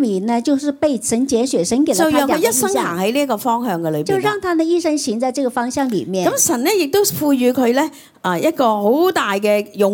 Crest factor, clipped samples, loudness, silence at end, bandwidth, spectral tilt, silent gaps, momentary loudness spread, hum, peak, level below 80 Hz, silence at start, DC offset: 14 dB; under 0.1%; -17 LUFS; 0 s; 18 kHz; -4 dB/octave; none; 5 LU; none; -2 dBFS; -56 dBFS; 0 s; under 0.1%